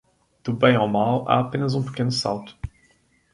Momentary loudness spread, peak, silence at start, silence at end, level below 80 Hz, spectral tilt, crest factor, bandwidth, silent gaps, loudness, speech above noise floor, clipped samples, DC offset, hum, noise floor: 17 LU; -2 dBFS; 0.45 s; 0.65 s; -48 dBFS; -6 dB/octave; 20 dB; 11.5 kHz; none; -22 LUFS; 40 dB; under 0.1%; under 0.1%; none; -61 dBFS